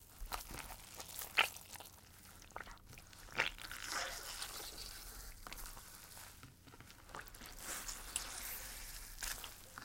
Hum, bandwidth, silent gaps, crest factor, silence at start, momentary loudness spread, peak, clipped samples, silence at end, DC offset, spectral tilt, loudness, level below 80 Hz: none; 17 kHz; none; 32 dB; 0 s; 17 LU; -16 dBFS; under 0.1%; 0 s; under 0.1%; -0.5 dB/octave; -44 LUFS; -58 dBFS